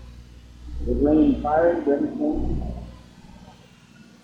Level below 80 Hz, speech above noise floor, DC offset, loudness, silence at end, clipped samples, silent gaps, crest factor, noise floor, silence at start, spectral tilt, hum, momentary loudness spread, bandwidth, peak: -34 dBFS; 29 dB; under 0.1%; -22 LUFS; 0.75 s; under 0.1%; none; 16 dB; -50 dBFS; 0 s; -9 dB/octave; 60 Hz at -35 dBFS; 19 LU; 7 kHz; -8 dBFS